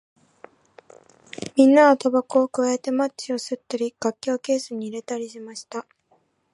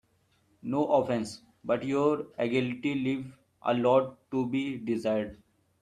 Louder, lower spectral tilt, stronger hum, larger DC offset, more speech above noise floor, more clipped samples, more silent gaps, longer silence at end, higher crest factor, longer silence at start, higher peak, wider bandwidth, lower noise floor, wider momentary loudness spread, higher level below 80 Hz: first, -22 LUFS vs -29 LUFS; second, -4 dB/octave vs -6.5 dB/octave; neither; neither; about the same, 43 dB vs 41 dB; neither; neither; first, 0.7 s vs 0.45 s; about the same, 20 dB vs 20 dB; first, 1.4 s vs 0.65 s; first, -4 dBFS vs -10 dBFS; about the same, 11.5 kHz vs 12 kHz; second, -65 dBFS vs -69 dBFS; first, 19 LU vs 11 LU; second, -72 dBFS vs -66 dBFS